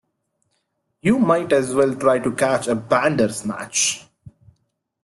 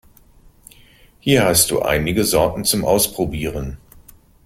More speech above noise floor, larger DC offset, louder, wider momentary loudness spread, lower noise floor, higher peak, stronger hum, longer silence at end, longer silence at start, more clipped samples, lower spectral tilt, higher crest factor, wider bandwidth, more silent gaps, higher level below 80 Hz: first, 53 dB vs 32 dB; neither; about the same, -19 LUFS vs -17 LUFS; second, 6 LU vs 12 LU; first, -72 dBFS vs -49 dBFS; second, -4 dBFS vs 0 dBFS; neither; about the same, 0.75 s vs 0.7 s; second, 1.05 s vs 1.25 s; neither; about the same, -4 dB/octave vs -3.5 dB/octave; about the same, 18 dB vs 20 dB; second, 12.5 kHz vs 16.5 kHz; neither; second, -58 dBFS vs -38 dBFS